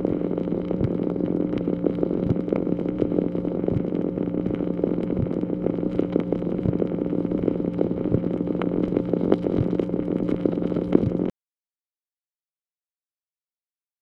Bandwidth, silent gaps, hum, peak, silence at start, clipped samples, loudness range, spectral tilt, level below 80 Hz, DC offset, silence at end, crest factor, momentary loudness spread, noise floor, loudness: 5 kHz; none; none; 0 dBFS; 0 s; under 0.1%; 3 LU; -11 dB/octave; -46 dBFS; under 0.1%; 2.7 s; 24 dB; 4 LU; under -90 dBFS; -25 LUFS